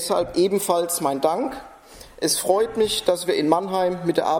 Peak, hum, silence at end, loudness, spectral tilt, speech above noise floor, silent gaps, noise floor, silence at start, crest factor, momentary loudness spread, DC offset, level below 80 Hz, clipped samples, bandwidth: -4 dBFS; none; 0 s; -22 LUFS; -3.5 dB/octave; 23 dB; none; -44 dBFS; 0 s; 18 dB; 5 LU; under 0.1%; -54 dBFS; under 0.1%; 18 kHz